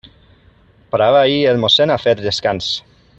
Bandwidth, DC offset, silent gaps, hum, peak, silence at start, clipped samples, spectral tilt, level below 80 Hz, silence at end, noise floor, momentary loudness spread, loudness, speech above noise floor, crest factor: 8.2 kHz; under 0.1%; none; none; -2 dBFS; 0.95 s; under 0.1%; -4.5 dB/octave; -52 dBFS; 0.4 s; -50 dBFS; 10 LU; -14 LUFS; 36 dB; 16 dB